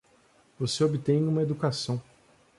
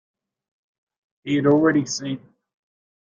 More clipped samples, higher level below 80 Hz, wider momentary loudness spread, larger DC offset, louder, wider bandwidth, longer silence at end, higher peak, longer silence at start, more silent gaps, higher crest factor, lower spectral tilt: neither; about the same, -64 dBFS vs -66 dBFS; second, 9 LU vs 17 LU; neither; second, -28 LUFS vs -20 LUFS; first, 11.5 kHz vs 7.6 kHz; second, 0.55 s vs 0.9 s; second, -12 dBFS vs -6 dBFS; second, 0.6 s vs 1.25 s; neither; about the same, 16 dB vs 18 dB; about the same, -6 dB/octave vs -5.5 dB/octave